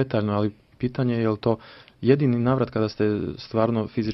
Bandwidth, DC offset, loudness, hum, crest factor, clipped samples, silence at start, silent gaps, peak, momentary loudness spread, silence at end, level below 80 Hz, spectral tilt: 6 kHz; under 0.1%; -24 LUFS; none; 18 dB; under 0.1%; 0 s; none; -4 dBFS; 9 LU; 0 s; -54 dBFS; -9.5 dB/octave